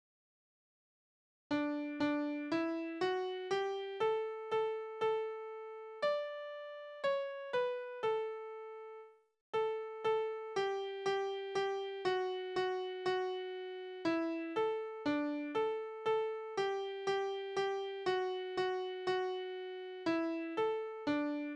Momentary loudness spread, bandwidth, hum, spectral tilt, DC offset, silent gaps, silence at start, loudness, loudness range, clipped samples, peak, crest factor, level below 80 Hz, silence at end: 8 LU; 9.4 kHz; none; -5 dB/octave; under 0.1%; 9.41-9.53 s; 1.5 s; -38 LUFS; 2 LU; under 0.1%; -22 dBFS; 16 dB; -80 dBFS; 0 s